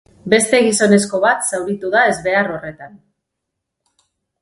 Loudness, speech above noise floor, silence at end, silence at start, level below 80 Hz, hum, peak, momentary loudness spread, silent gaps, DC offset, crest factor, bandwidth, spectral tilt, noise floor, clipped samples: -15 LUFS; 62 dB; 1.45 s; 0.25 s; -56 dBFS; none; 0 dBFS; 10 LU; none; under 0.1%; 18 dB; 12 kHz; -3.5 dB/octave; -78 dBFS; under 0.1%